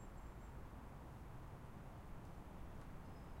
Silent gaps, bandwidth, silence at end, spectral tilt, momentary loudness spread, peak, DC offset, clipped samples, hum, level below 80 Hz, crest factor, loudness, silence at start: none; 16 kHz; 0 s; -7 dB/octave; 0 LU; -42 dBFS; under 0.1%; under 0.1%; none; -58 dBFS; 12 dB; -57 LUFS; 0 s